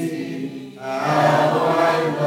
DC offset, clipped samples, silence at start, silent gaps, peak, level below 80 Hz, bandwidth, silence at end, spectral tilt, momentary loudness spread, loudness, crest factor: under 0.1%; under 0.1%; 0 s; none; -4 dBFS; -68 dBFS; 17 kHz; 0 s; -6 dB/octave; 14 LU; -19 LUFS; 16 dB